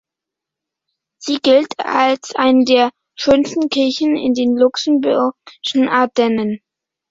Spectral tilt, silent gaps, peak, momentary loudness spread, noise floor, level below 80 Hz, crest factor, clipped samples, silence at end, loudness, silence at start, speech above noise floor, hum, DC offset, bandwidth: -4 dB/octave; none; -2 dBFS; 8 LU; -84 dBFS; -56 dBFS; 14 dB; under 0.1%; 0.55 s; -15 LUFS; 1.2 s; 69 dB; none; under 0.1%; 7.8 kHz